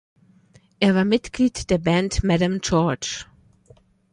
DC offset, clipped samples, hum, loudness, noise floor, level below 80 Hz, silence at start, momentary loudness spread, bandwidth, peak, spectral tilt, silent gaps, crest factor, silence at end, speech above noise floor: under 0.1%; under 0.1%; none; -21 LUFS; -55 dBFS; -40 dBFS; 0.8 s; 6 LU; 11 kHz; -4 dBFS; -5.5 dB/octave; none; 18 dB; 0.9 s; 35 dB